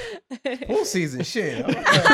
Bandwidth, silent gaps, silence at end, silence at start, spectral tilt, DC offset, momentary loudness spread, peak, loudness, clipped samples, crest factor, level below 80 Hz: 16 kHz; none; 0 s; 0 s; -4 dB/octave; under 0.1%; 13 LU; -2 dBFS; -23 LUFS; under 0.1%; 20 dB; -54 dBFS